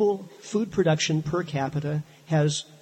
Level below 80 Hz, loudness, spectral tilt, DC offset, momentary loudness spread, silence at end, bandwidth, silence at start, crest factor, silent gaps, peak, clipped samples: -58 dBFS; -26 LUFS; -5.5 dB/octave; under 0.1%; 8 LU; 0.05 s; 8.8 kHz; 0 s; 16 dB; none; -10 dBFS; under 0.1%